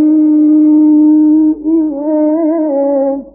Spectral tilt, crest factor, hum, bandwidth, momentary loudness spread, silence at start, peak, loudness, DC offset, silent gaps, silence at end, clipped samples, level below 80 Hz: -15.5 dB/octave; 6 dB; none; 2.1 kHz; 6 LU; 0 s; -2 dBFS; -10 LUFS; under 0.1%; none; 0.05 s; under 0.1%; -50 dBFS